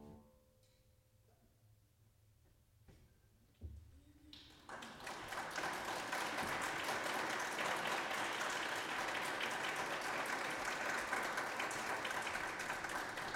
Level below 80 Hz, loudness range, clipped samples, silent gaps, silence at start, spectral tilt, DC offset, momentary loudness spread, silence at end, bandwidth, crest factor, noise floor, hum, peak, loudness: -68 dBFS; 12 LU; under 0.1%; none; 0 s; -2 dB/octave; under 0.1%; 16 LU; 0 s; 16.5 kHz; 18 dB; -72 dBFS; none; -26 dBFS; -41 LUFS